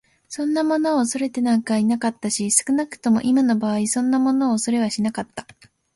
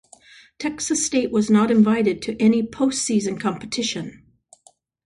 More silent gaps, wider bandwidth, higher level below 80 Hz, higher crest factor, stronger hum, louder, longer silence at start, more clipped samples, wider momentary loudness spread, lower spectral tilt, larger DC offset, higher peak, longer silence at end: neither; about the same, 11.5 kHz vs 11.5 kHz; second, -62 dBFS vs -56 dBFS; about the same, 18 dB vs 16 dB; neither; about the same, -20 LUFS vs -21 LUFS; second, 0.3 s vs 0.6 s; neither; second, 7 LU vs 11 LU; about the same, -4 dB/octave vs -4.5 dB/octave; neither; first, -2 dBFS vs -6 dBFS; second, 0.55 s vs 0.95 s